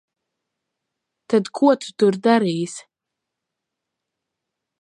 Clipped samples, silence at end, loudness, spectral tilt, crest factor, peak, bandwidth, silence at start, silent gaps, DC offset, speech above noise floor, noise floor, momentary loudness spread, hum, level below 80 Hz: under 0.1%; 2 s; -19 LUFS; -5.5 dB/octave; 22 dB; -2 dBFS; 11 kHz; 1.3 s; none; under 0.1%; 65 dB; -83 dBFS; 11 LU; none; -74 dBFS